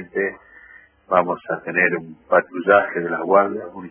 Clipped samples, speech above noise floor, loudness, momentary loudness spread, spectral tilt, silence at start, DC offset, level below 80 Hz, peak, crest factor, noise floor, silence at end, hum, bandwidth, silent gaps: under 0.1%; 28 dB; -19 LUFS; 9 LU; -9.5 dB/octave; 0 s; under 0.1%; -60 dBFS; -2 dBFS; 20 dB; -48 dBFS; 0 s; none; 3.5 kHz; none